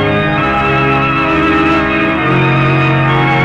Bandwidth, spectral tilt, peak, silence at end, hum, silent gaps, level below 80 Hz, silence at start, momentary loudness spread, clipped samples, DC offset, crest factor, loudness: 7.6 kHz; -7.5 dB/octave; -2 dBFS; 0 s; none; none; -32 dBFS; 0 s; 2 LU; under 0.1%; under 0.1%; 10 dB; -11 LUFS